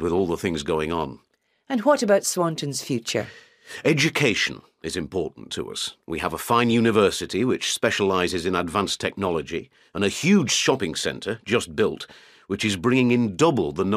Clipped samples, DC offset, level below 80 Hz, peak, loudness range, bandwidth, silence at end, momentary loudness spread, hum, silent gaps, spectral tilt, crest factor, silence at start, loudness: under 0.1%; under 0.1%; -52 dBFS; -4 dBFS; 3 LU; 15.5 kHz; 0 s; 12 LU; none; none; -4 dB/octave; 20 dB; 0 s; -23 LUFS